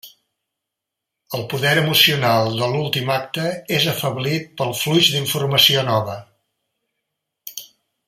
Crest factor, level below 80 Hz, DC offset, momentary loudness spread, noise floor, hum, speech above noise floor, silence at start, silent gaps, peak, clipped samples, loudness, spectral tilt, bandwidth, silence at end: 20 dB; -60 dBFS; under 0.1%; 18 LU; -83 dBFS; none; 64 dB; 0.05 s; none; 0 dBFS; under 0.1%; -17 LUFS; -4 dB/octave; 16 kHz; 0.45 s